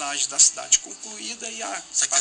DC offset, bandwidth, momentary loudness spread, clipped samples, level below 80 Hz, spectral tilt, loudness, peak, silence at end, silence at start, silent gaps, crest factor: under 0.1%; 10 kHz; 16 LU; under 0.1%; -64 dBFS; 2 dB/octave; -20 LUFS; -4 dBFS; 0 s; 0 s; none; 20 dB